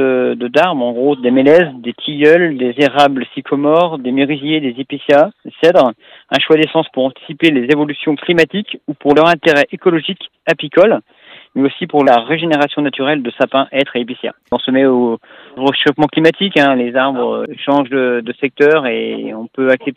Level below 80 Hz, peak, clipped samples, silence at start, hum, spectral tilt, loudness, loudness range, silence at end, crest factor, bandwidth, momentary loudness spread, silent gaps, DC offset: -58 dBFS; 0 dBFS; under 0.1%; 0 s; none; -6 dB/octave; -13 LUFS; 2 LU; 0.05 s; 14 dB; 10 kHz; 10 LU; none; under 0.1%